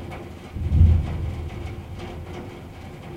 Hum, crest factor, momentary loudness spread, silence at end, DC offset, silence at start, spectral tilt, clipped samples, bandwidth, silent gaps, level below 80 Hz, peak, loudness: none; 20 dB; 20 LU; 0 s; under 0.1%; 0 s; -8.5 dB/octave; under 0.1%; 6.2 kHz; none; -28 dBFS; -4 dBFS; -24 LUFS